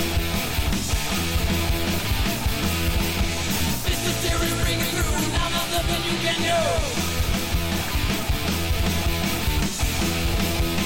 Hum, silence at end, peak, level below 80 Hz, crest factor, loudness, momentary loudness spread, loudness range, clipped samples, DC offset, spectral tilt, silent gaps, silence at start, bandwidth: none; 0 s; -12 dBFS; -28 dBFS; 10 dB; -23 LUFS; 2 LU; 1 LU; under 0.1%; 2%; -4 dB/octave; none; 0 s; 17 kHz